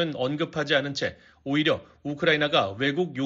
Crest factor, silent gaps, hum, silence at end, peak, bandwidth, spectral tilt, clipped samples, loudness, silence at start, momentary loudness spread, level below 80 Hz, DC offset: 18 dB; none; none; 0 s; -8 dBFS; 7.6 kHz; -3 dB/octave; under 0.1%; -25 LUFS; 0 s; 9 LU; -62 dBFS; under 0.1%